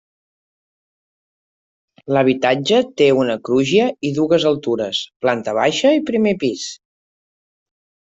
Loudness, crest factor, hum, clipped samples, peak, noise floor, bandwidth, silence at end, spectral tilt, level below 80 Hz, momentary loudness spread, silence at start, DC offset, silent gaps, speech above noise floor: -17 LUFS; 16 dB; none; under 0.1%; -2 dBFS; under -90 dBFS; 8 kHz; 1.45 s; -5 dB/octave; -60 dBFS; 6 LU; 2.05 s; under 0.1%; 5.16-5.20 s; over 73 dB